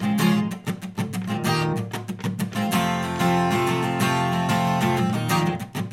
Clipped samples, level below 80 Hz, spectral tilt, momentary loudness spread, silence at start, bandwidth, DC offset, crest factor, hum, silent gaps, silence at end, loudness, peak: under 0.1%; -56 dBFS; -5.5 dB/octave; 9 LU; 0 s; 16.5 kHz; under 0.1%; 16 dB; none; none; 0 s; -23 LUFS; -8 dBFS